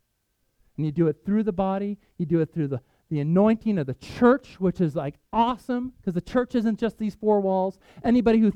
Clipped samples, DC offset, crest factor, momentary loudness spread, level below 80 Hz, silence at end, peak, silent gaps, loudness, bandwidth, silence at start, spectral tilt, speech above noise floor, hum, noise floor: under 0.1%; under 0.1%; 18 dB; 10 LU; -52 dBFS; 0 s; -6 dBFS; none; -25 LUFS; 8.6 kHz; 0.8 s; -9 dB/octave; 49 dB; none; -73 dBFS